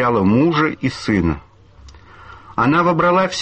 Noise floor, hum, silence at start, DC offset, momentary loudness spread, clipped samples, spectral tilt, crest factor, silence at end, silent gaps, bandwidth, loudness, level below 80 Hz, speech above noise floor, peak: -43 dBFS; none; 0 s; under 0.1%; 8 LU; under 0.1%; -6.5 dB/octave; 12 dB; 0 s; none; 8.8 kHz; -16 LUFS; -40 dBFS; 27 dB; -4 dBFS